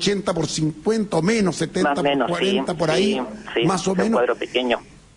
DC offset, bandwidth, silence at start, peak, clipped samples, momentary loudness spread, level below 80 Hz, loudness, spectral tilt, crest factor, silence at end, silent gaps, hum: under 0.1%; 11 kHz; 0 s; -8 dBFS; under 0.1%; 4 LU; -50 dBFS; -21 LUFS; -5 dB/octave; 14 dB; 0.3 s; none; none